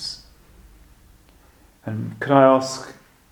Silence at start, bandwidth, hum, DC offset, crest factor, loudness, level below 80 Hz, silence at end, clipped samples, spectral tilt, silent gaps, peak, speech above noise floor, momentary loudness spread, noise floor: 0 s; 17.5 kHz; none; under 0.1%; 24 dB; -19 LUFS; -54 dBFS; 0.4 s; under 0.1%; -5.5 dB/octave; none; 0 dBFS; 35 dB; 23 LU; -53 dBFS